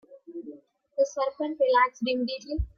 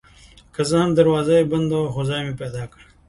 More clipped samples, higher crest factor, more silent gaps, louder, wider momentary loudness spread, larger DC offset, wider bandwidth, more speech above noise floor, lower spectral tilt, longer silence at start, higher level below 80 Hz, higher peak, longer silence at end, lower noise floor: neither; about the same, 18 dB vs 18 dB; neither; second, -27 LUFS vs -20 LUFS; first, 20 LU vs 16 LU; neither; second, 7.2 kHz vs 11.5 kHz; second, 21 dB vs 29 dB; second, -5 dB/octave vs -6.5 dB/octave; second, 0.1 s vs 0.6 s; first, -42 dBFS vs -48 dBFS; second, -10 dBFS vs -4 dBFS; second, 0.1 s vs 0.4 s; about the same, -48 dBFS vs -48 dBFS